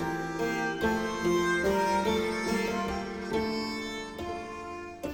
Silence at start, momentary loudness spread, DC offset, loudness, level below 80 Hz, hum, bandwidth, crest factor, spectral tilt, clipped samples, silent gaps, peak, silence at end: 0 s; 11 LU; under 0.1%; -30 LUFS; -50 dBFS; none; 18 kHz; 14 dB; -4.5 dB/octave; under 0.1%; none; -16 dBFS; 0 s